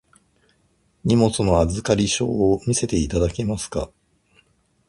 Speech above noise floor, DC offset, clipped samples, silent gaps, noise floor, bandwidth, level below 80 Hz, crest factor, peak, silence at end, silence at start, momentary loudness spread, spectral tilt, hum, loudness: 44 dB; under 0.1%; under 0.1%; none; -64 dBFS; 11.5 kHz; -36 dBFS; 20 dB; -4 dBFS; 1.05 s; 1.05 s; 10 LU; -5.5 dB/octave; none; -21 LUFS